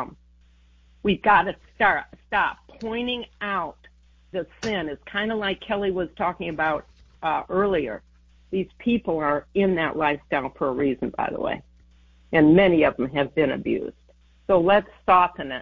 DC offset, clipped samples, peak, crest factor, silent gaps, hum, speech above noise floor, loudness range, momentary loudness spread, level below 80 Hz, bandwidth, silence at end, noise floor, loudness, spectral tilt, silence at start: under 0.1%; under 0.1%; -6 dBFS; 18 dB; none; none; 33 dB; 7 LU; 12 LU; -50 dBFS; 7.6 kHz; 0 s; -56 dBFS; -23 LUFS; -7 dB/octave; 0 s